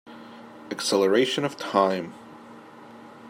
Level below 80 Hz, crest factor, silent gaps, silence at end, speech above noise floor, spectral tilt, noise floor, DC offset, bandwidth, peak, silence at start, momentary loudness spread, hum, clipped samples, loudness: -76 dBFS; 20 dB; none; 0 s; 22 dB; -4 dB/octave; -46 dBFS; under 0.1%; 16 kHz; -6 dBFS; 0.05 s; 25 LU; none; under 0.1%; -24 LUFS